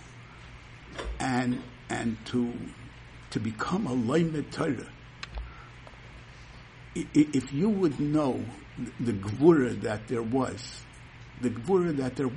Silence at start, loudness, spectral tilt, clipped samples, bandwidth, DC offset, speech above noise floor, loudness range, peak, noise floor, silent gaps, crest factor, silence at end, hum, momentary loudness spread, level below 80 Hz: 0 s; -29 LUFS; -6.5 dB/octave; under 0.1%; 10.5 kHz; under 0.1%; 20 dB; 6 LU; -8 dBFS; -48 dBFS; none; 22 dB; 0 s; none; 22 LU; -50 dBFS